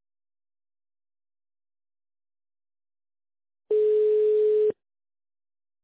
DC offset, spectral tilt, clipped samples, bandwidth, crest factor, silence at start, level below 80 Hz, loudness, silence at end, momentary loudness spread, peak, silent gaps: under 0.1%; -8.5 dB/octave; under 0.1%; 4 kHz; 12 dB; 3.7 s; -78 dBFS; -23 LUFS; 1.1 s; 6 LU; -16 dBFS; none